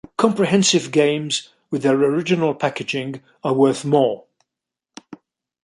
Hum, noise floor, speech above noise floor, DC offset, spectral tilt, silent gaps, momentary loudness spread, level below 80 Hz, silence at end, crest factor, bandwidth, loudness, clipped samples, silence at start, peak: none; -85 dBFS; 67 dB; under 0.1%; -4.5 dB/octave; none; 10 LU; -64 dBFS; 0.5 s; 18 dB; 11.5 kHz; -19 LUFS; under 0.1%; 0.2 s; -2 dBFS